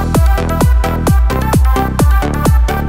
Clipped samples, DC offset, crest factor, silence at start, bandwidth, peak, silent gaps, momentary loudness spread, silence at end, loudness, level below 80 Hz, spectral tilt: under 0.1%; under 0.1%; 10 dB; 0 s; 16.5 kHz; 0 dBFS; none; 1 LU; 0 s; -13 LUFS; -12 dBFS; -6.5 dB/octave